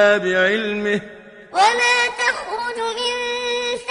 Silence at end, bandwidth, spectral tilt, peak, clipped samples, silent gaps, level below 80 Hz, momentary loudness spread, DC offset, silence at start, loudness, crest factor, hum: 0 s; 11 kHz; -2.5 dB/octave; -2 dBFS; under 0.1%; none; -58 dBFS; 10 LU; under 0.1%; 0 s; -19 LUFS; 18 dB; none